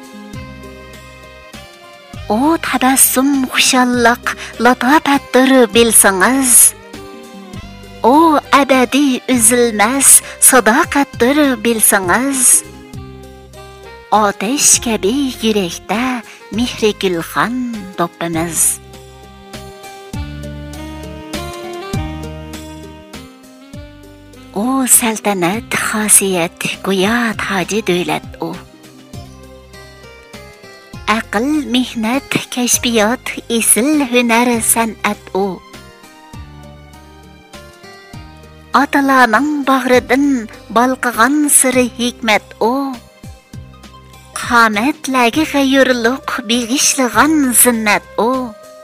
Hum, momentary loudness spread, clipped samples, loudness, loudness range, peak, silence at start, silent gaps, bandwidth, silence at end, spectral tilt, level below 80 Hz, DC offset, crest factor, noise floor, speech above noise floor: none; 21 LU; 0.1%; -12 LUFS; 14 LU; 0 dBFS; 0 s; none; 16.5 kHz; 0 s; -2.5 dB/octave; -40 dBFS; under 0.1%; 14 dB; -39 dBFS; 27 dB